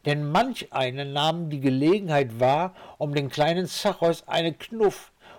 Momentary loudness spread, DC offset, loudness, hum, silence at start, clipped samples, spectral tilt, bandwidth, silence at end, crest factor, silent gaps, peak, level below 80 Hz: 5 LU; under 0.1%; -25 LUFS; none; 0.05 s; under 0.1%; -5.5 dB/octave; 18 kHz; 0 s; 10 dB; none; -14 dBFS; -60 dBFS